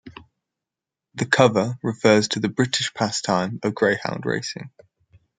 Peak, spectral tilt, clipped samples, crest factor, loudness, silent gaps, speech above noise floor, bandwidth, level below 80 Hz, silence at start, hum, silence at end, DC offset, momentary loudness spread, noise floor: 0 dBFS; -4.5 dB/octave; under 0.1%; 22 dB; -21 LUFS; none; 66 dB; 9.6 kHz; -62 dBFS; 0.05 s; none; 0.7 s; under 0.1%; 11 LU; -87 dBFS